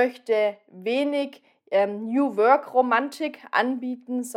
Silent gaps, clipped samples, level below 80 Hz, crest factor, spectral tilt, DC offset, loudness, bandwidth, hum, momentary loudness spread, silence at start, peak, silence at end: none; under 0.1%; under -90 dBFS; 18 dB; -4.5 dB/octave; under 0.1%; -24 LUFS; 16 kHz; none; 11 LU; 0 s; -6 dBFS; 0.05 s